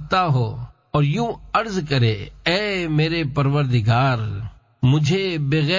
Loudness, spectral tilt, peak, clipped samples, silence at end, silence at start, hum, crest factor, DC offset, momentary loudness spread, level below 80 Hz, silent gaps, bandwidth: -20 LUFS; -6.5 dB/octave; -4 dBFS; under 0.1%; 0 s; 0 s; none; 16 dB; under 0.1%; 7 LU; -44 dBFS; none; 7.6 kHz